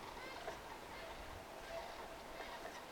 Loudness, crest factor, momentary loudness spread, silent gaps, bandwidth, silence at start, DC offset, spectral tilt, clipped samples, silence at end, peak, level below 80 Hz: -50 LUFS; 16 dB; 3 LU; none; 18 kHz; 0 s; under 0.1%; -3 dB/octave; under 0.1%; 0 s; -34 dBFS; -62 dBFS